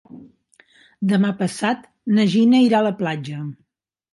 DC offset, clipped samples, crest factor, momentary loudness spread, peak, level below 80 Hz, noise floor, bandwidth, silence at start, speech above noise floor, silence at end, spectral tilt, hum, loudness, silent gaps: under 0.1%; under 0.1%; 14 dB; 14 LU; -6 dBFS; -68 dBFS; -77 dBFS; 11.5 kHz; 0.15 s; 59 dB; 0.6 s; -6.5 dB/octave; none; -19 LUFS; none